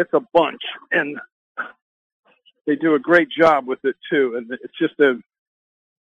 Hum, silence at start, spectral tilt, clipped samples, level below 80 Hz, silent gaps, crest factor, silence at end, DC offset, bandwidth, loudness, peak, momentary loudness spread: none; 0 s; -6.5 dB/octave; under 0.1%; -64 dBFS; 1.32-1.55 s, 1.82-2.23 s; 18 dB; 0.8 s; under 0.1%; 7.6 kHz; -19 LUFS; -2 dBFS; 16 LU